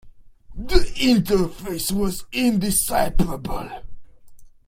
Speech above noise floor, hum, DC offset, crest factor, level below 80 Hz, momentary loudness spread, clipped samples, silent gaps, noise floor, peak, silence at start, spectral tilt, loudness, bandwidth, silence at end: 22 dB; none; under 0.1%; 20 dB; -30 dBFS; 13 LU; under 0.1%; none; -42 dBFS; 0 dBFS; 0.05 s; -4.5 dB/octave; -22 LUFS; 16.5 kHz; 0.2 s